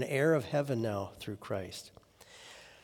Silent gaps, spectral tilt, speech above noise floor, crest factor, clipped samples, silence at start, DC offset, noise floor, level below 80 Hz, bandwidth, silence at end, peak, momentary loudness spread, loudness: none; -6 dB/octave; 23 dB; 18 dB; under 0.1%; 0 s; under 0.1%; -56 dBFS; -70 dBFS; 19 kHz; 0.1 s; -18 dBFS; 22 LU; -34 LUFS